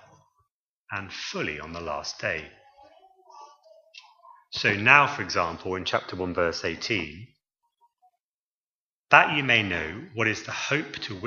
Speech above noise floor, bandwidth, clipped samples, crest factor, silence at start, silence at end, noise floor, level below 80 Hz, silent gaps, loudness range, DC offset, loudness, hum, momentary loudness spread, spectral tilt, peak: over 64 dB; 7.4 kHz; under 0.1%; 28 dB; 0.9 s; 0 s; under -90 dBFS; -58 dBFS; 8.22-9.04 s; 10 LU; under 0.1%; -24 LUFS; none; 16 LU; -4 dB/octave; 0 dBFS